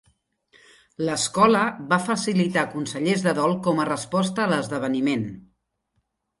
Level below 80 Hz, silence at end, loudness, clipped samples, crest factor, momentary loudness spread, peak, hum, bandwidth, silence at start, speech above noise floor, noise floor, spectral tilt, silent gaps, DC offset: -62 dBFS; 1 s; -23 LUFS; under 0.1%; 20 dB; 8 LU; -4 dBFS; none; 11.5 kHz; 1 s; 51 dB; -74 dBFS; -5 dB/octave; none; under 0.1%